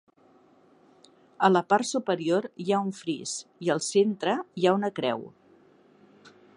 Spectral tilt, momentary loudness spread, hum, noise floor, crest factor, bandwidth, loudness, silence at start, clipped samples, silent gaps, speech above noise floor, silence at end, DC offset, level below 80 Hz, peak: -4.5 dB/octave; 9 LU; none; -60 dBFS; 22 dB; 11 kHz; -27 LUFS; 1.4 s; under 0.1%; none; 34 dB; 0.3 s; under 0.1%; -80 dBFS; -8 dBFS